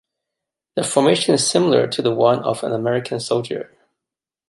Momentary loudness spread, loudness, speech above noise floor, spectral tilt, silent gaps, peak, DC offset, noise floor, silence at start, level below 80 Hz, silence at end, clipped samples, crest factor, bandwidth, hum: 12 LU; -18 LUFS; 69 dB; -4.5 dB/octave; none; -2 dBFS; under 0.1%; -87 dBFS; 0.75 s; -64 dBFS; 0.85 s; under 0.1%; 18 dB; 11.5 kHz; none